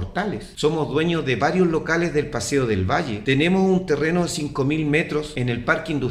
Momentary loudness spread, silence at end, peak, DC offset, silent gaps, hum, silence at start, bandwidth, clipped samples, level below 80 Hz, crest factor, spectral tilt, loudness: 6 LU; 0 s; -4 dBFS; under 0.1%; none; none; 0 s; 14 kHz; under 0.1%; -44 dBFS; 16 dB; -5.5 dB/octave; -21 LUFS